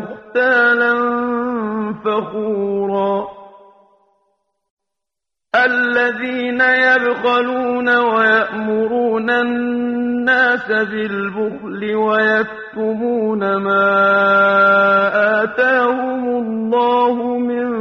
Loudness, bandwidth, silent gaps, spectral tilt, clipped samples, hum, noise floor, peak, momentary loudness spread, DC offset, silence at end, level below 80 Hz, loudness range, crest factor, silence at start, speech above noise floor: -15 LUFS; 6.6 kHz; 4.70-4.77 s; -6.5 dB/octave; under 0.1%; none; -84 dBFS; -2 dBFS; 9 LU; under 0.1%; 0 s; -60 dBFS; 8 LU; 14 dB; 0 s; 68 dB